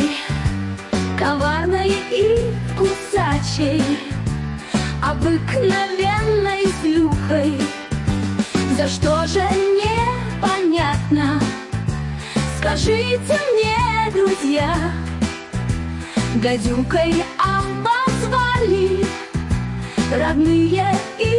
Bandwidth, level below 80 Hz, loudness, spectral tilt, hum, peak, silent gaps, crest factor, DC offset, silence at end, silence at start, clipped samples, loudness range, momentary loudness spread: 11.5 kHz; -34 dBFS; -19 LUFS; -5.5 dB/octave; none; -6 dBFS; none; 12 dB; under 0.1%; 0 s; 0 s; under 0.1%; 2 LU; 7 LU